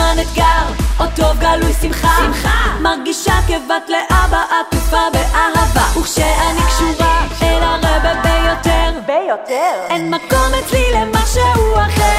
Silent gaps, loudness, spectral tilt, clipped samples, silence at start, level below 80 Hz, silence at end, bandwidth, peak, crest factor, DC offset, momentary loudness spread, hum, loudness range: none; -14 LUFS; -4.5 dB/octave; under 0.1%; 0 s; -18 dBFS; 0 s; 16 kHz; 0 dBFS; 12 dB; under 0.1%; 4 LU; none; 1 LU